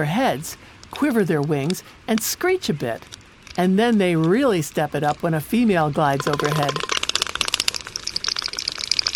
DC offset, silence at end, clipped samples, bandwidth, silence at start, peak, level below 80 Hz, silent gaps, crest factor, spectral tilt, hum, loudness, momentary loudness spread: under 0.1%; 0 s; under 0.1%; 19.5 kHz; 0 s; 0 dBFS; -52 dBFS; none; 22 dB; -4.5 dB/octave; none; -21 LUFS; 11 LU